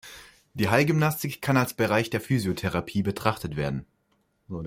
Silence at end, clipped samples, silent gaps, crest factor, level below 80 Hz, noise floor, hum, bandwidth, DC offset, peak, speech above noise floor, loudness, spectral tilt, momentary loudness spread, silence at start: 0 s; under 0.1%; none; 22 dB; -54 dBFS; -70 dBFS; none; 16.5 kHz; under 0.1%; -6 dBFS; 45 dB; -26 LUFS; -6 dB/octave; 11 LU; 0.05 s